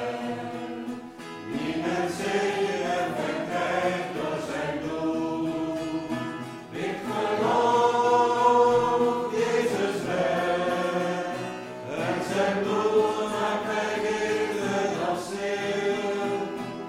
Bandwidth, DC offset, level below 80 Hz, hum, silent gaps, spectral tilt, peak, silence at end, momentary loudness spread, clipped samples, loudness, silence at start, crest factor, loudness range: 15.5 kHz; under 0.1%; -62 dBFS; none; none; -5 dB/octave; -8 dBFS; 0 s; 12 LU; under 0.1%; -26 LUFS; 0 s; 18 dB; 6 LU